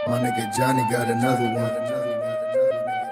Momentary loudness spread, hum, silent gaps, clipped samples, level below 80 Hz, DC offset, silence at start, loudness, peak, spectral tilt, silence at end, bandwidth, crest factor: 5 LU; none; none; under 0.1%; -60 dBFS; under 0.1%; 0 s; -23 LUFS; -8 dBFS; -5.5 dB/octave; 0 s; 16 kHz; 14 dB